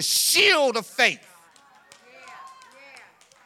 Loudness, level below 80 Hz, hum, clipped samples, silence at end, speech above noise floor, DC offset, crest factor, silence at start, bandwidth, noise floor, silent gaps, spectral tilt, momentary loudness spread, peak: -19 LUFS; -74 dBFS; none; under 0.1%; 0.95 s; 34 dB; under 0.1%; 22 dB; 0 s; 18 kHz; -55 dBFS; none; 0 dB/octave; 8 LU; -4 dBFS